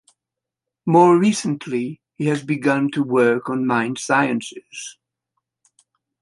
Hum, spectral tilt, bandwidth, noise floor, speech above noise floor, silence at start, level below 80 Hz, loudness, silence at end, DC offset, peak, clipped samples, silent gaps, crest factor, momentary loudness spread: none; -5.5 dB/octave; 11.5 kHz; -86 dBFS; 67 dB; 0.85 s; -68 dBFS; -19 LUFS; 1.3 s; under 0.1%; -2 dBFS; under 0.1%; none; 18 dB; 18 LU